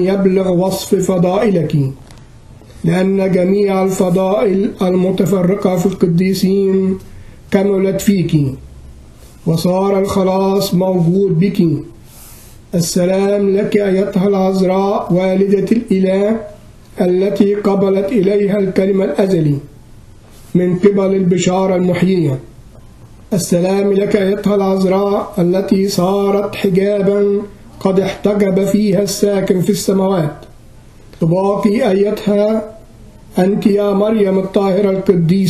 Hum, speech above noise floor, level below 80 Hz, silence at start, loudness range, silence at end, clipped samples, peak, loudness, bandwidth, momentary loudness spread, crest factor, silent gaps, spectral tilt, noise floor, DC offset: none; 26 dB; -42 dBFS; 0 s; 2 LU; 0 s; under 0.1%; 0 dBFS; -14 LUFS; 14 kHz; 5 LU; 14 dB; none; -7 dB/octave; -39 dBFS; under 0.1%